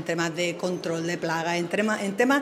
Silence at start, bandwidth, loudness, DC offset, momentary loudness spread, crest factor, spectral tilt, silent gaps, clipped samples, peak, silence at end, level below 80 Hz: 0 s; 16 kHz; -26 LUFS; under 0.1%; 4 LU; 16 dB; -4.5 dB/octave; none; under 0.1%; -10 dBFS; 0 s; -72 dBFS